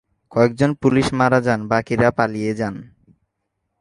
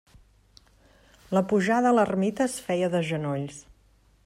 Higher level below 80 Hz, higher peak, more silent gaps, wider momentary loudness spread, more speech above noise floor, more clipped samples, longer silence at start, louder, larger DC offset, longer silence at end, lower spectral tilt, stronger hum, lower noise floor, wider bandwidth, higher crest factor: first, -48 dBFS vs -60 dBFS; first, -2 dBFS vs -10 dBFS; neither; about the same, 9 LU vs 11 LU; first, 57 dB vs 36 dB; neither; second, 0.3 s vs 1.3 s; first, -19 LUFS vs -25 LUFS; neither; first, 0.95 s vs 0.65 s; about the same, -7 dB/octave vs -6 dB/octave; neither; first, -75 dBFS vs -61 dBFS; second, 11.5 kHz vs 15 kHz; about the same, 18 dB vs 16 dB